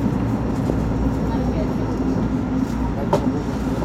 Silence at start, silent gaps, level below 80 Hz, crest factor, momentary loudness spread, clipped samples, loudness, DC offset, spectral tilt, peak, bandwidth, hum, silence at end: 0 s; none; -30 dBFS; 16 dB; 2 LU; under 0.1%; -22 LUFS; under 0.1%; -8 dB/octave; -4 dBFS; 13.5 kHz; none; 0 s